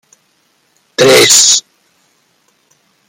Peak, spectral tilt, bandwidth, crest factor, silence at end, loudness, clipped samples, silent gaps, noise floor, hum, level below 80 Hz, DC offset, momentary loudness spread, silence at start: 0 dBFS; -1 dB/octave; over 20 kHz; 14 dB; 1.5 s; -6 LUFS; 0.3%; none; -57 dBFS; none; -56 dBFS; under 0.1%; 9 LU; 1 s